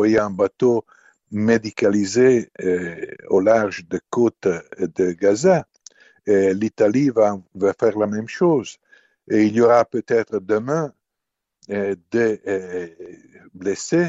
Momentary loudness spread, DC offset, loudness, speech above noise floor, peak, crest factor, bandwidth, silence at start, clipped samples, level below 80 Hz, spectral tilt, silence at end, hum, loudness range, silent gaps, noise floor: 11 LU; under 0.1%; -20 LUFS; 63 dB; -2 dBFS; 18 dB; 8 kHz; 0 s; under 0.1%; -60 dBFS; -6 dB/octave; 0 s; none; 4 LU; none; -82 dBFS